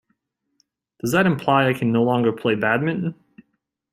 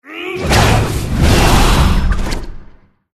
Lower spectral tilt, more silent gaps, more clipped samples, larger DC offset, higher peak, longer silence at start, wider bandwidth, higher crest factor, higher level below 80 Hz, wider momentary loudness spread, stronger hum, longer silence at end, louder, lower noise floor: first, -6.5 dB/octave vs -5 dB/octave; neither; neither; neither; second, -4 dBFS vs 0 dBFS; first, 1.05 s vs 0.05 s; first, 16 kHz vs 14 kHz; first, 18 dB vs 12 dB; second, -60 dBFS vs -16 dBFS; second, 8 LU vs 12 LU; neither; first, 0.8 s vs 0.45 s; second, -20 LUFS vs -13 LUFS; first, -73 dBFS vs -40 dBFS